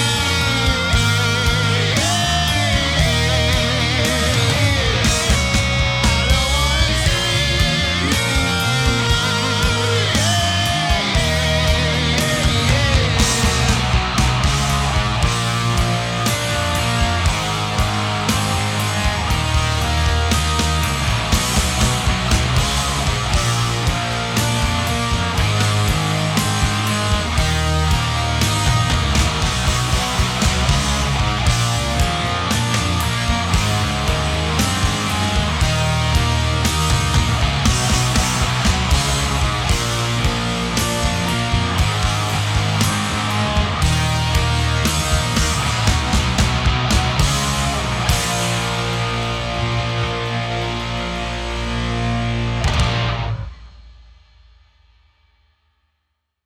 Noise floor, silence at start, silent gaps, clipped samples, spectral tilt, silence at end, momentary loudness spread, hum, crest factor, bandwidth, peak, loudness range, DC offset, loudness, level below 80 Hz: -73 dBFS; 0 s; none; under 0.1%; -4 dB/octave; 2.55 s; 4 LU; none; 16 dB; 17 kHz; -2 dBFS; 4 LU; under 0.1%; -17 LUFS; -24 dBFS